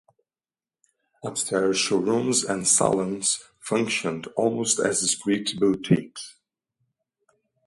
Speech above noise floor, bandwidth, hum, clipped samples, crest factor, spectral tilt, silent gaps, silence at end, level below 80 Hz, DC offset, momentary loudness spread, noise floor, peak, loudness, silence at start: over 66 dB; 11.5 kHz; none; under 0.1%; 22 dB; -3.5 dB/octave; none; 1.35 s; -64 dBFS; under 0.1%; 9 LU; under -90 dBFS; -4 dBFS; -23 LUFS; 1.25 s